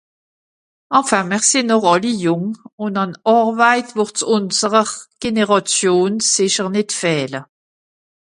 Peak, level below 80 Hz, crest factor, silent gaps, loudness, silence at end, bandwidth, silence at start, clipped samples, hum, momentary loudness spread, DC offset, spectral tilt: 0 dBFS; -60 dBFS; 18 dB; 2.73-2.78 s; -16 LUFS; 0.95 s; 11.5 kHz; 0.9 s; under 0.1%; none; 8 LU; under 0.1%; -3 dB/octave